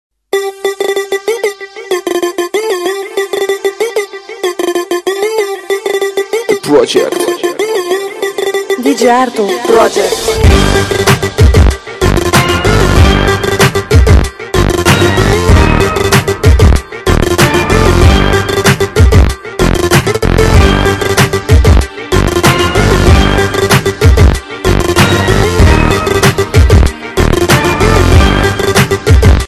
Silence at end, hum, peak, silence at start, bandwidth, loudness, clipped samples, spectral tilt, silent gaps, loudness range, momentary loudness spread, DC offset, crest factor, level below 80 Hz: 0 s; none; 0 dBFS; 0.35 s; 16 kHz; -10 LUFS; 4%; -5 dB/octave; none; 6 LU; 8 LU; under 0.1%; 8 dB; -14 dBFS